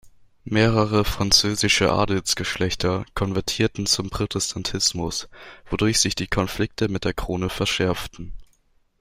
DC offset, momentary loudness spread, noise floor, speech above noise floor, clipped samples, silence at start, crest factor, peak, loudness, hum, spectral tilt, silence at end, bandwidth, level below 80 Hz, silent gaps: under 0.1%; 10 LU; -62 dBFS; 40 dB; under 0.1%; 0.05 s; 22 dB; -2 dBFS; -22 LUFS; none; -3.5 dB/octave; 0.55 s; 16 kHz; -40 dBFS; none